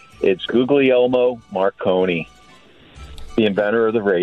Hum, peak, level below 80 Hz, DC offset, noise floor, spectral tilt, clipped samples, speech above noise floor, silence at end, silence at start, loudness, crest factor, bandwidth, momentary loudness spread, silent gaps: none; -4 dBFS; -46 dBFS; under 0.1%; -48 dBFS; -7 dB/octave; under 0.1%; 31 dB; 0 s; 0.2 s; -18 LUFS; 14 dB; 8.6 kHz; 7 LU; none